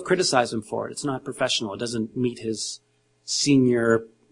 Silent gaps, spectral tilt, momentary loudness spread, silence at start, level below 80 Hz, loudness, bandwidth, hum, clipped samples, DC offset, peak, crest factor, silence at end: none; -4 dB/octave; 11 LU; 0 s; -62 dBFS; -24 LUFS; 11 kHz; none; under 0.1%; under 0.1%; -4 dBFS; 20 dB; 0.25 s